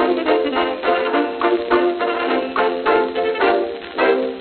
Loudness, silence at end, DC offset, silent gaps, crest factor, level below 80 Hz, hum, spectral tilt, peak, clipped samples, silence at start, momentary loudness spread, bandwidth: -18 LUFS; 0 s; under 0.1%; none; 16 dB; -54 dBFS; none; -7.5 dB/octave; -2 dBFS; under 0.1%; 0 s; 3 LU; 4.6 kHz